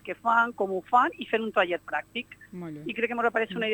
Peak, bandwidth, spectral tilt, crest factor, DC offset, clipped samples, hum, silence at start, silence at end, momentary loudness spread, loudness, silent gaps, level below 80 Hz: -8 dBFS; 19 kHz; -5.5 dB/octave; 18 dB; under 0.1%; under 0.1%; 50 Hz at -60 dBFS; 0.05 s; 0 s; 14 LU; -27 LUFS; none; -68 dBFS